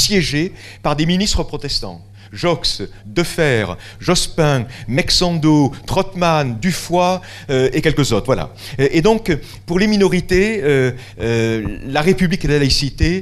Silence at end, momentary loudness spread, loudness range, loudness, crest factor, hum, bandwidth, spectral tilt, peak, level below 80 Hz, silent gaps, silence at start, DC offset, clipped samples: 0 s; 8 LU; 3 LU; -17 LUFS; 16 dB; none; 14.5 kHz; -5 dB/octave; 0 dBFS; -30 dBFS; none; 0 s; under 0.1%; under 0.1%